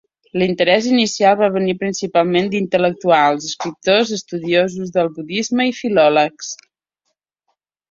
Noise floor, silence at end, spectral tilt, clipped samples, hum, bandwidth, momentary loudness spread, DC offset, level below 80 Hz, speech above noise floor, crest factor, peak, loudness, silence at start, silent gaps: -74 dBFS; 1.35 s; -4.5 dB/octave; under 0.1%; none; 7.8 kHz; 9 LU; under 0.1%; -60 dBFS; 58 dB; 16 dB; -2 dBFS; -16 LUFS; 0.35 s; none